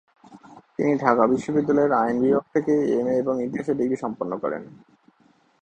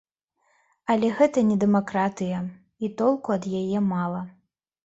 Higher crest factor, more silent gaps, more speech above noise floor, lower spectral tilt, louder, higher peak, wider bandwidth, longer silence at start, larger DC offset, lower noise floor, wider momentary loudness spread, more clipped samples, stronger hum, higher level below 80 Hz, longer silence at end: about the same, 22 dB vs 18 dB; neither; second, 39 dB vs 47 dB; about the same, -8 dB/octave vs -7.5 dB/octave; about the same, -23 LUFS vs -24 LUFS; first, -2 dBFS vs -6 dBFS; first, 9 kHz vs 8 kHz; second, 0.3 s vs 0.9 s; neither; second, -61 dBFS vs -70 dBFS; second, 9 LU vs 13 LU; neither; neither; about the same, -62 dBFS vs -64 dBFS; first, 0.9 s vs 0.55 s